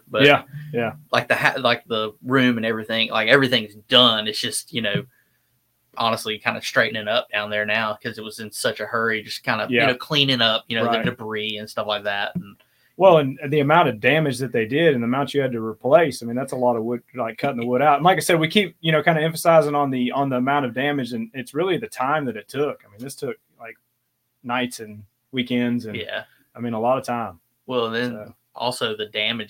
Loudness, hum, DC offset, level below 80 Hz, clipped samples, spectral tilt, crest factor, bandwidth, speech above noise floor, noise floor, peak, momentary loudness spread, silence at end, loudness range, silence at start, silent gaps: -21 LUFS; none; under 0.1%; -64 dBFS; under 0.1%; -4.5 dB/octave; 22 dB; 17 kHz; 51 dB; -72 dBFS; 0 dBFS; 13 LU; 0.05 s; 8 LU; 0.1 s; none